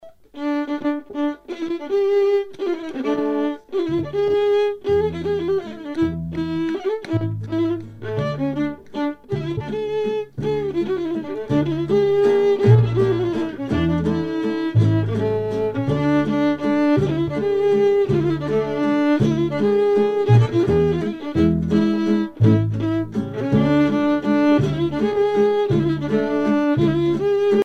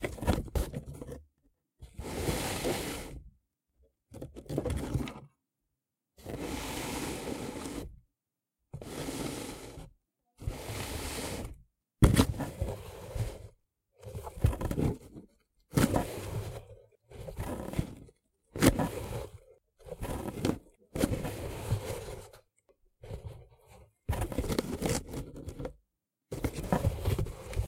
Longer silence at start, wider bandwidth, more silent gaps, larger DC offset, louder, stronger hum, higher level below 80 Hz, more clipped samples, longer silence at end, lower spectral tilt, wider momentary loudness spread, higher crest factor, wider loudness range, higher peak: about the same, 0.05 s vs 0 s; second, 8.2 kHz vs 16 kHz; neither; neither; first, -20 LUFS vs -35 LUFS; neither; about the same, -44 dBFS vs -42 dBFS; neither; about the same, 0 s vs 0 s; first, -8.5 dB/octave vs -5.5 dB/octave; second, 9 LU vs 19 LU; second, 16 dB vs 28 dB; about the same, 6 LU vs 8 LU; first, -2 dBFS vs -8 dBFS